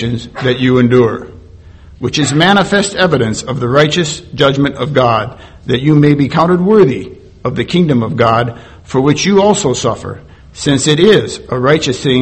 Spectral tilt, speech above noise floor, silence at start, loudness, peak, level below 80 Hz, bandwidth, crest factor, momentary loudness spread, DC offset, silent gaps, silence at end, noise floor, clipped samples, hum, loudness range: -5.5 dB/octave; 25 dB; 0 s; -12 LUFS; 0 dBFS; -40 dBFS; 8.8 kHz; 12 dB; 11 LU; under 0.1%; none; 0 s; -36 dBFS; 0.2%; none; 1 LU